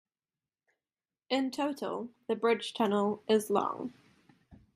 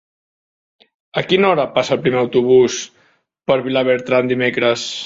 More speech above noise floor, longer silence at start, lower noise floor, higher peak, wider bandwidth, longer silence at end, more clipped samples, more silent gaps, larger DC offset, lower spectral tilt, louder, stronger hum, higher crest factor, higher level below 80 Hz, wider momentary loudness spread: first, over 59 dB vs 43 dB; first, 1.3 s vs 1.15 s; first, under -90 dBFS vs -58 dBFS; second, -12 dBFS vs -2 dBFS; first, 15 kHz vs 7.8 kHz; first, 0.2 s vs 0 s; neither; neither; neither; about the same, -5 dB/octave vs -4.5 dB/octave; second, -32 LUFS vs -16 LUFS; neither; first, 22 dB vs 16 dB; second, -76 dBFS vs -58 dBFS; about the same, 10 LU vs 11 LU